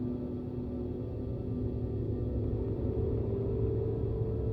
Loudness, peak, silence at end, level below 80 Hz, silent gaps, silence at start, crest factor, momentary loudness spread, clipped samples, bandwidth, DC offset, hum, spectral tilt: -34 LUFS; -20 dBFS; 0 s; -40 dBFS; none; 0 s; 12 dB; 5 LU; under 0.1%; 4.6 kHz; under 0.1%; none; -12.5 dB/octave